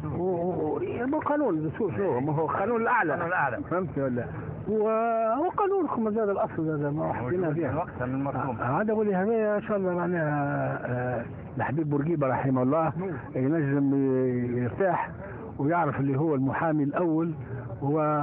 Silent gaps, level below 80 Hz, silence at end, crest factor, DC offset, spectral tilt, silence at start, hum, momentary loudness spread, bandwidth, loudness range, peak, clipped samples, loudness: none; -54 dBFS; 0 s; 14 dB; under 0.1%; -12.5 dB/octave; 0 s; none; 6 LU; 3.7 kHz; 1 LU; -14 dBFS; under 0.1%; -27 LUFS